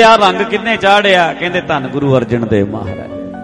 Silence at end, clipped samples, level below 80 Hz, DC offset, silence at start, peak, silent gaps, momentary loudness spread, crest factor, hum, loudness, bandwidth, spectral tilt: 0 s; under 0.1%; -42 dBFS; under 0.1%; 0 s; 0 dBFS; none; 14 LU; 12 dB; none; -12 LUFS; 11.5 kHz; -5.5 dB/octave